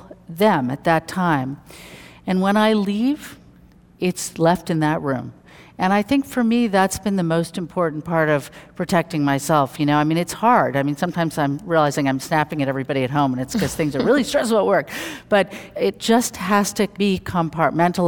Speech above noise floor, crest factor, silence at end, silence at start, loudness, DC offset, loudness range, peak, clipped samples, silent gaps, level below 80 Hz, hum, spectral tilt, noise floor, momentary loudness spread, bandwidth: 29 dB; 18 dB; 0 s; 0.05 s; -20 LUFS; under 0.1%; 2 LU; -2 dBFS; under 0.1%; none; -52 dBFS; none; -5.5 dB/octave; -49 dBFS; 8 LU; 19 kHz